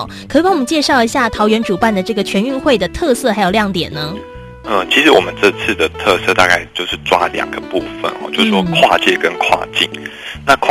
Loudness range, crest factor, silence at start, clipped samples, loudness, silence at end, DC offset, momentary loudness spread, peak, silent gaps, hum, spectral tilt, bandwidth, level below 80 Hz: 2 LU; 14 dB; 0 s; 0.2%; -13 LUFS; 0 s; under 0.1%; 11 LU; 0 dBFS; none; none; -4 dB/octave; 14.5 kHz; -40 dBFS